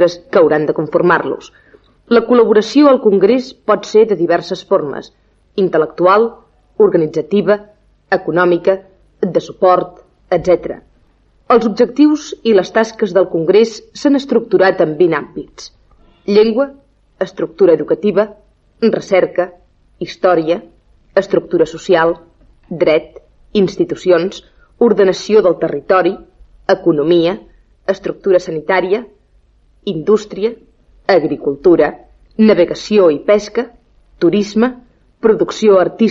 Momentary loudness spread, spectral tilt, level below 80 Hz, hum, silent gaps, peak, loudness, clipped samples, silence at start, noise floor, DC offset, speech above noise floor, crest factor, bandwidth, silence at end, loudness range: 12 LU; -6 dB/octave; -50 dBFS; none; none; 0 dBFS; -13 LUFS; under 0.1%; 0 s; -52 dBFS; under 0.1%; 40 dB; 14 dB; 7.8 kHz; 0 s; 4 LU